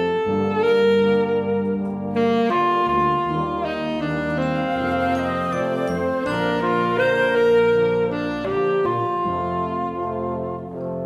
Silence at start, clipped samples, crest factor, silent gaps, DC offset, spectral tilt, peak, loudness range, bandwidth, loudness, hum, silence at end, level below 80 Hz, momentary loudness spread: 0 s; under 0.1%; 14 dB; none; under 0.1%; -7 dB/octave; -8 dBFS; 3 LU; 11.5 kHz; -21 LUFS; none; 0 s; -48 dBFS; 8 LU